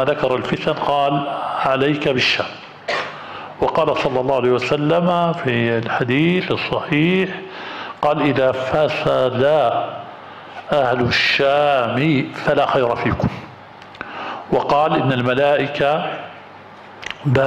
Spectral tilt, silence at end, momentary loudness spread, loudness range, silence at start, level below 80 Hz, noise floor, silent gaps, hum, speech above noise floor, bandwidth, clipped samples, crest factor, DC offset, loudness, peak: -6.5 dB/octave; 0 s; 15 LU; 2 LU; 0 s; -48 dBFS; -39 dBFS; none; none; 22 dB; 11.5 kHz; under 0.1%; 12 dB; under 0.1%; -18 LUFS; -6 dBFS